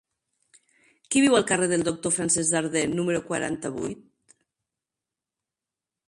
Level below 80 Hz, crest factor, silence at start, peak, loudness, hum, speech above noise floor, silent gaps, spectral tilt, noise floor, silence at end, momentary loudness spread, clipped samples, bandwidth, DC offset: -62 dBFS; 20 dB; 1.1 s; -8 dBFS; -24 LUFS; none; 65 dB; none; -3.5 dB/octave; -89 dBFS; 2.1 s; 12 LU; under 0.1%; 11.5 kHz; under 0.1%